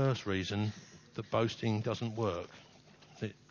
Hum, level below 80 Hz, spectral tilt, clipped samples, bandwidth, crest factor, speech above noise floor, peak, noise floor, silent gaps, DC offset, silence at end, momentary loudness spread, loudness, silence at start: none; -60 dBFS; -6.5 dB/octave; under 0.1%; 7.2 kHz; 18 dB; 23 dB; -18 dBFS; -59 dBFS; none; under 0.1%; 0.15 s; 15 LU; -36 LUFS; 0 s